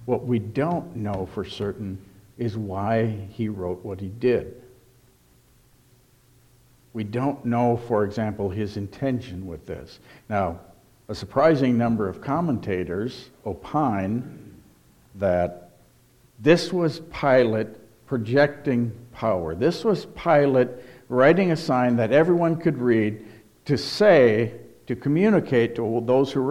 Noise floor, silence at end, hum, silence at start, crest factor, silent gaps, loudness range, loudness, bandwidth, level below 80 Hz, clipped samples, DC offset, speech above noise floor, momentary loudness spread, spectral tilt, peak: -58 dBFS; 0 s; none; 0 s; 18 dB; none; 9 LU; -23 LUFS; 15.5 kHz; -54 dBFS; under 0.1%; under 0.1%; 35 dB; 16 LU; -7.5 dB/octave; -4 dBFS